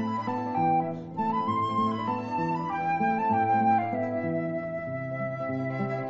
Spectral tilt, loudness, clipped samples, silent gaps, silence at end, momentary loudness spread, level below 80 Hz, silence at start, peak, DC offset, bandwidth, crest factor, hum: -6 dB/octave; -28 LUFS; under 0.1%; none; 0 s; 8 LU; -66 dBFS; 0 s; -14 dBFS; under 0.1%; 7.8 kHz; 14 dB; none